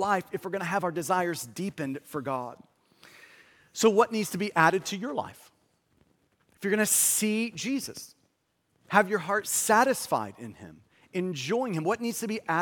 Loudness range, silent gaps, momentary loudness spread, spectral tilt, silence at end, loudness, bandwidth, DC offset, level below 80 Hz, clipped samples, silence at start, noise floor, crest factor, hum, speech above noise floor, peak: 4 LU; none; 14 LU; -3.5 dB/octave; 0 s; -27 LUFS; 17.5 kHz; under 0.1%; -74 dBFS; under 0.1%; 0 s; -74 dBFS; 24 dB; none; 46 dB; -4 dBFS